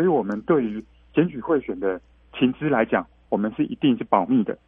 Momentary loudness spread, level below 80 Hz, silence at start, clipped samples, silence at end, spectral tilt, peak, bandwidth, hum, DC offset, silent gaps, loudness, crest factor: 8 LU; -56 dBFS; 0 s; under 0.1%; 0.1 s; -9.5 dB/octave; -2 dBFS; 3.7 kHz; none; under 0.1%; none; -23 LUFS; 20 dB